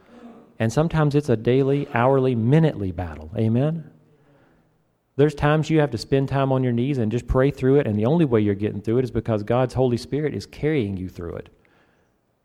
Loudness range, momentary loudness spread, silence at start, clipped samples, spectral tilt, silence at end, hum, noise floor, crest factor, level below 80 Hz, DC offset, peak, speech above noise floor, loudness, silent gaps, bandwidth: 4 LU; 10 LU; 0.15 s; under 0.1%; -8 dB/octave; 1.05 s; none; -65 dBFS; 18 dB; -44 dBFS; under 0.1%; -4 dBFS; 45 dB; -22 LUFS; none; 11.5 kHz